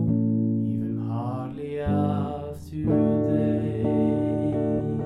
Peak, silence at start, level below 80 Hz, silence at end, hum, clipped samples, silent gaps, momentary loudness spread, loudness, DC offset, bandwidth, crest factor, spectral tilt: -10 dBFS; 0 s; -48 dBFS; 0 s; none; under 0.1%; none; 9 LU; -25 LUFS; under 0.1%; 8.8 kHz; 14 dB; -10.5 dB/octave